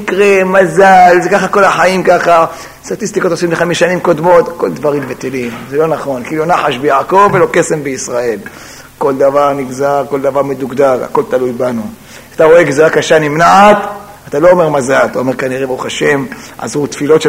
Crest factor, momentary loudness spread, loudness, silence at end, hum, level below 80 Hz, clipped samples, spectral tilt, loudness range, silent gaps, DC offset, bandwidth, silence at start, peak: 10 dB; 12 LU; -10 LUFS; 0 s; none; -46 dBFS; 0.8%; -5 dB/octave; 5 LU; none; under 0.1%; 16.5 kHz; 0 s; 0 dBFS